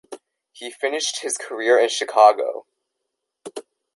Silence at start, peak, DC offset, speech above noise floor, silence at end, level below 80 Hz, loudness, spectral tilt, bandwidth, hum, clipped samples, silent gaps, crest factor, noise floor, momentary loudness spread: 0.1 s; -2 dBFS; under 0.1%; 60 dB; 0.35 s; -80 dBFS; -19 LUFS; 0.5 dB/octave; 11.5 kHz; none; under 0.1%; none; 20 dB; -80 dBFS; 22 LU